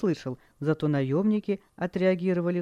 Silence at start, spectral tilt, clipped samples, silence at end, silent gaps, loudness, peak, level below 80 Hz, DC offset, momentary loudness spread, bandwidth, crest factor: 0 s; -8.5 dB/octave; under 0.1%; 0 s; none; -27 LUFS; -12 dBFS; -62 dBFS; under 0.1%; 8 LU; 9.6 kHz; 16 dB